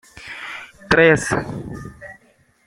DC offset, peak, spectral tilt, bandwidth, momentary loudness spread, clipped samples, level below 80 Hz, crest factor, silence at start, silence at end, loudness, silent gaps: under 0.1%; -2 dBFS; -5 dB/octave; 13 kHz; 23 LU; under 0.1%; -46 dBFS; 20 dB; 0.15 s; 0.55 s; -16 LUFS; none